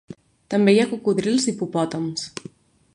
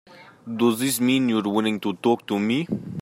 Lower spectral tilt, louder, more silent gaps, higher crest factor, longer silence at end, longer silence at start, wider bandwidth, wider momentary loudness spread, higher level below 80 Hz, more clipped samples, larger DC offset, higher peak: about the same, -5 dB/octave vs -5 dB/octave; about the same, -21 LUFS vs -23 LUFS; neither; about the same, 18 dB vs 16 dB; first, 0.65 s vs 0 s; about the same, 0.1 s vs 0.1 s; second, 11 kHz vs 16 kHz; first, 13 LU vs 7 LU; about the same, -64 dBFS vs -68 dBFS; neither; neither; first, -4 dBFS vs -8 dBFS